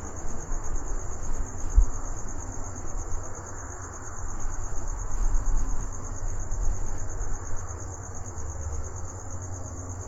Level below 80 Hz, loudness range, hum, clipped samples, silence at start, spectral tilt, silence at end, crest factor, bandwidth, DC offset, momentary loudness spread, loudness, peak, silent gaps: -30 dBFS; 3 LU; none; under 0.1%; 0 s; -5.5 dB/octave; 0 s; 20 dB; 7.8 kHz; under 0.1%; 7 LU; -35 LUFS; -6 dBFS; none